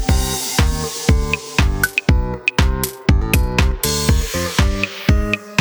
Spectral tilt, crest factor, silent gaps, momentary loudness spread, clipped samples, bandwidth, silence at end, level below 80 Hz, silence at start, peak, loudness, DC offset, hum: -4.5 dB/octave; 16 dB; none; 3 LU; under 0.1%; over 20 kHz; 0 s; -20 dBFS; 0 s; 0 dBFS; -18 LUFS; under 0.1%; none